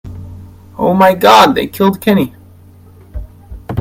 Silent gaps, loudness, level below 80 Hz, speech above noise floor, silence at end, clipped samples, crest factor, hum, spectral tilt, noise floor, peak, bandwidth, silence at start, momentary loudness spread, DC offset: none; -10 LUFS; -36 dBFS; 30 dB; 0 s; 0.4%; 14 dB; none; -5.5 dB/octave; -39 dBFS; 0 dBFS; 17 kHz; 0.05 s; 26 LU; under 0.1%